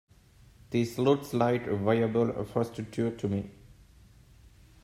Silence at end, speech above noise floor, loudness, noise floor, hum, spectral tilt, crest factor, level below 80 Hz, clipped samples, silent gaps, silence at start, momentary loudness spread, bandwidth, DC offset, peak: 1.35 s; 29 dB; -29 LUFS; -58 dBFS; none; -7.5 dB/octave; 20 dB; -60 dBFS; under 0.1%; none; 0.7 s; 7 LU; 16 kHz; under 0.1%; -12 dBFS